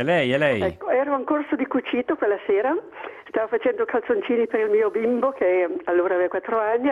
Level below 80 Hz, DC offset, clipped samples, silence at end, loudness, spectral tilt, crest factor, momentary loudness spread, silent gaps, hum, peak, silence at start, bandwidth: -62 dBFS; under 0.1%; under 0.1%; 0 s; -22 LUFS; -7 dB/octave; 14 dB; 5 LU; none; none; -8 dBFS; 0 s; 10 kHz